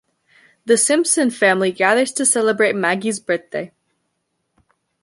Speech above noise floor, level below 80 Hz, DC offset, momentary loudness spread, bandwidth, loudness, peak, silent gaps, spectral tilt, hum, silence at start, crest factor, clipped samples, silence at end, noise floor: 55 dB; -70 dBFS; under 0.1%; 12 LU; 12 kHz; -16 LUFS; -2 dBFS; none; -2.5 dB/octave; none; 0.65 s; 18 dB; under 0.1%; 1.35 s; -72 dBFS